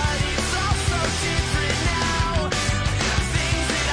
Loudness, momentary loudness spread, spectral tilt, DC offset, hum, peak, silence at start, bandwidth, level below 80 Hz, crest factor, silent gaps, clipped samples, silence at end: -22 LUFS; 1 LU; -3.5 dB/octave; under 0.1%; none; -10 dBFS; 0 s; 10.5 kHz; -28 dBFS; 12 dB; none; under 0.1%; 0 s